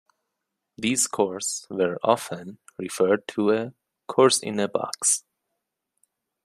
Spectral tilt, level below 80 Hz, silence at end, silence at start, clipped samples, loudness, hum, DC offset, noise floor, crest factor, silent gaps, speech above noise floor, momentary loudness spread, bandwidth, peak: -3 dB/octave; -72 dBFS; 1.25 s; 0.8 s; under 0.1%; -24 LUFS; none; under 0.1%; -82 dBFS; 22 dB; none; 58 dB; 15 LU; 15 kHz; -4 dBFS